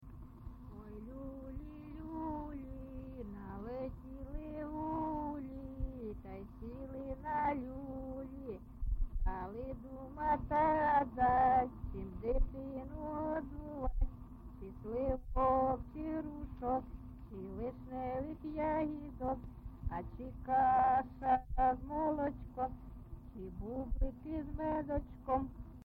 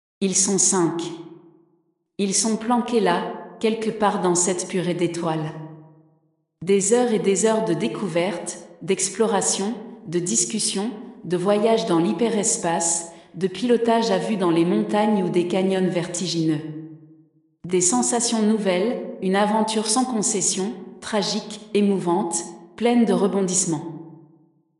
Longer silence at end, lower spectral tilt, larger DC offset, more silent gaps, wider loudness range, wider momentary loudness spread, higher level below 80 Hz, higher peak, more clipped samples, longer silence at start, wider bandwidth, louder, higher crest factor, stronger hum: second, 0 s vs 0.65 s; first, -10 dB/octave vs -4 dB/octave; neither; neither; first, 9 LU vs 2 LU; first, 17 LU vs 12 LU; first, -46 dBFS vs -70 dBFS; second, -22 dBFS vs -6 dBFS; neither; second, 0 s vs 0.2 s; second, 4.8 kHz vs 11 kHz; second, -38 LUFS vs -21 LUFS; about the same, 16 dB vs 16 dB; neither